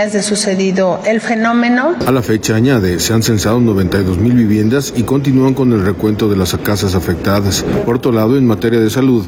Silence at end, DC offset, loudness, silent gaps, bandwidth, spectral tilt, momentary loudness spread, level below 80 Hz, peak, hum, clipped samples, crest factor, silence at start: 0 s; under 0.1%; -13 LUFS; none; 18 kHz; -5.5 dB/octave; 3 LU; -38 dBFS; -2 dBFS; none; under 0.1%; 10 dB; 0 s